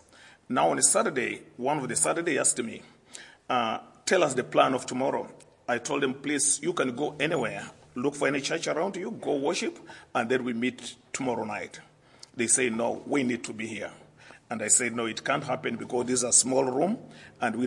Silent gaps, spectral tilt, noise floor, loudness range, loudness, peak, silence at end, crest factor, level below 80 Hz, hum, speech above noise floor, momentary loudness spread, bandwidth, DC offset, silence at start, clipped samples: none; -2.5 dB/octave; -53 dBFS; 4 LU; -27 LUFS; -6 dBFS; 0 s; 22 dB; -72 dBFS; none; 25 dB; 15 LU; 11.5 kHz; under 0.1%; 0.2 s; under 0.1%